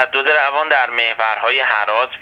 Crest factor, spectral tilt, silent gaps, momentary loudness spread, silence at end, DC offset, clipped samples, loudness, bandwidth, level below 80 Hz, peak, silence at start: 16 dB; -2.5 dB/octave; none; 3 LU; 0 s; under 0.1%; under 0.1%; -15 LUFS; 7.8 kHz; -64 dBFS; 0 dBFS; 0 s